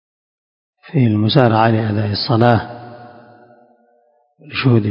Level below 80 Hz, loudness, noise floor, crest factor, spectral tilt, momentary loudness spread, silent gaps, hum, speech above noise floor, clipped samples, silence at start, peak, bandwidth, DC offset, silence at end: -48 dBFS; -15 LUFS; -58 dBFS; 18 dB; -9.5 dB/octave; 15 LU; none; none; 44 dB; under 0.1%; 0.95 s; 0 dBFS; 5.4 kHz; under 0.1%; 0 s